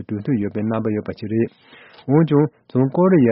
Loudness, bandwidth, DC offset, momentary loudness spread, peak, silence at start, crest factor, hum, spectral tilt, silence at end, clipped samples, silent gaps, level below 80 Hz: -20 LUFS; 5.6 kHz; under 0.1%; 10 LU; -4 dBFS; 0 s; 16 dB; none; -9 dB/octave; 0 s; under 0.1%; none; -56 dBFS